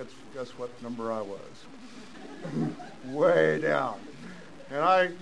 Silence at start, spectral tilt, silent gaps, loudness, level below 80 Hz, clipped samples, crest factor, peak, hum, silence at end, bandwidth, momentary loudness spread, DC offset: 0 s; -6 dB/octave; none; -28 LUFS; -68 dBFS; under 0.1%; 20 dB; -10 dBFS; none; 0 s; 10.5 kHz; 23 LU; 0.4%